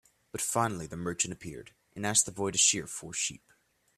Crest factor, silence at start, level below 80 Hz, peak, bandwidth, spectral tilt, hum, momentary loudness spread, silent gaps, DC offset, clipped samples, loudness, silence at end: 24 dB; 0.35 s; -64 dBFS; -10 dBFS; 15.5 kHz; -2 dB/octave; none; 19 LU; none; under 0.1%; under 0.1%; -29 LUFS; 0.6 s